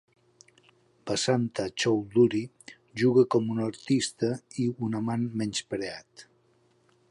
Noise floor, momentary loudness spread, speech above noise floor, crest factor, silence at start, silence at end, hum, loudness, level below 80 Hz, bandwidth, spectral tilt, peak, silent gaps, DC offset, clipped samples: -66 dBFS; 11 LU; 39 dB; 18 dB; 1.05 s; 0.85 s; none; -27 LUFS; -66 dBFS; 11.5 kHz; -5.5 dB/octave; -10 dBFS; none; under 0.1%; under 0.1%